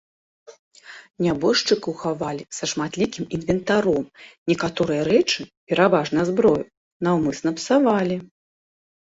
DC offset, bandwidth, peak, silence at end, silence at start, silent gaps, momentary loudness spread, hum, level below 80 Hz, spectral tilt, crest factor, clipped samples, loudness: under 0.1%; 8 kHz; -4 dBFS; 0.85 s; 0.5 s; 0.59-0.71 s, 1.10-1.14 s, 4.38-4.46 s, 5.57-5.67 s, 6.77-7.00 s; 10 LU; none; -54 dBFS; -5 dB/octave; 18 dB; under 0.1%; -22 LUFS